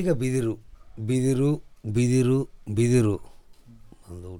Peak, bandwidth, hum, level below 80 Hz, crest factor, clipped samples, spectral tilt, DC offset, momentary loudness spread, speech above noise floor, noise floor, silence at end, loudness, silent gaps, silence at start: -10 dBFS; 16 kHz; none; -48 dBFS; 16 dB; under 0.1%; -7 dB/octave; under 0.1%; 14 LU; 25 dB; -48 dBFS; 0 s; -25 LUFS; none; 0 s